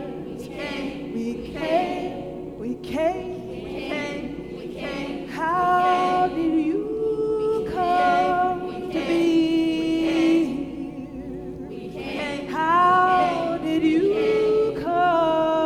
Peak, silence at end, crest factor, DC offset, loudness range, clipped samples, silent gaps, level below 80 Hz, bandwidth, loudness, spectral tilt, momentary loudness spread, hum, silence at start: -8 dBFS; 0 s; 14 dB; under 0.1%; 7 LU; under 0.1%; none; -50 dBFS; 12 kHz; -23 LUFS; -6 dB/octave; 14 LU; none; 0 s